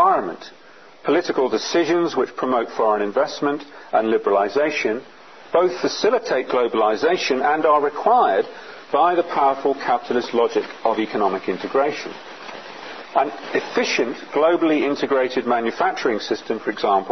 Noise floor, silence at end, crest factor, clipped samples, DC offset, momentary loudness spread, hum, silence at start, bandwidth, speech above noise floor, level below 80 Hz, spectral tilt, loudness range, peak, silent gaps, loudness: -47 dBFS; 0 s; 16 dB; under 0.1%; 0.3%; 10 LU; none; 0 s; 6.4 kHz; 27 dB; -70 dBFS; -4 dB/octave; 4 LU; -4 dBFS; none; -20 LUFS